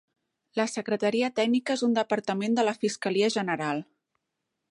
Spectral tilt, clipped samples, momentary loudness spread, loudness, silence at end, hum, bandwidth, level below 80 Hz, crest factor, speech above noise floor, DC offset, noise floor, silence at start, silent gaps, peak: -4.5 dB/octave; under 0.1%; 5 LU; -27 LUFS; 0.9 s; none; 11 kHz; -78 dBFS; 16 dB; 56 dB; under 0.1%; -83 dBFS; 0.55 s; none; -12 dBFS